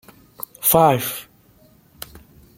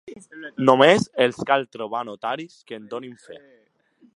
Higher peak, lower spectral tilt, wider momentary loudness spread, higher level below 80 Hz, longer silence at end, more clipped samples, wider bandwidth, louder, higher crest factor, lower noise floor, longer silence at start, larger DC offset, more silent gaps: about the same, -2 dBFS vs 0 dBFS; about the same, -4 dB/octave vs -5 dB/octave; about the same, 24 LU vs 23 LU; first, -54 dBFS vs -64 dBFS; first, 1.35 s vs 0.8 s; neither; first, 16.5 kHz vs 11.5 kHz; first, -17 LUFS vs -20 LUFS; about the same, 22 dB vs 22 dB; second, -53 dBFS vs -59 dBFS; first, 0.6 s vs 0.05 s; neither; neither